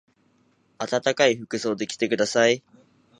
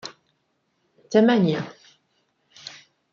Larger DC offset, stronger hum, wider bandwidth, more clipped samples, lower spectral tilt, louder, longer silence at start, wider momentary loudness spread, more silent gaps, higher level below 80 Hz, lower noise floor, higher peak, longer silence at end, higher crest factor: neither; neither; first, 11 kHz vs 7.2 kHz; neither; second, -3.5 dB/octave vs -6.5 dB/octave; second, -23 LUFS vs -20 LUFS; first, 0.8 s vs 0.05 s; second, 8 LU vs 23 LU; neither; about the same, -70 dBFS vs -72 dBFS; second, -64 dBFS vs -71 dBFS; about the same, -4 dBFS vs -4 dBFS; first, 0.6 s vs 0.45 s; about the same, 20 dB vs 20 dB